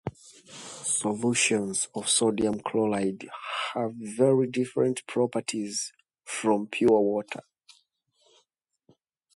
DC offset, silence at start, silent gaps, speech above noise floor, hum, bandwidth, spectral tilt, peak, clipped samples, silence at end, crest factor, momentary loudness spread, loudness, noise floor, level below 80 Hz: under 0.1%; 0.05 s; none; 48 dB; none; 11.5 kHz; -3.5 dB/octave; -10 dBFS; under 0.1%; 1.95 s; 18 dB; 14 LU; -27 LUFS; -75 dBFS; -66 dBFS